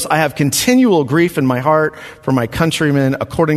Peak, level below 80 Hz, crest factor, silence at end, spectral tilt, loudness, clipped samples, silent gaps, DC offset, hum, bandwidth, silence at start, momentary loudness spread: 0 dBFS; -44 dBFS; 14 dB; 0 s; -5 dB/octave; -14 LUFS; under 0.1%; none; under 0.1%; none; 14 kHz; 0 s; 6 LU